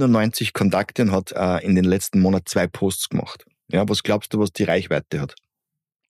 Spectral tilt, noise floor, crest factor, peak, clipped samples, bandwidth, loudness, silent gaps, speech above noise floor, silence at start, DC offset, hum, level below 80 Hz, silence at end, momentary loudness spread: -5.5 dB/octave; -85 dBFS; 14 dB; -6 dBFS; under 0.1%; 15 kHz; -21 LUFS; none; 65 dB; 0 s; under 0.1%; none; -52 dBFS; 0.8 s; 9 LU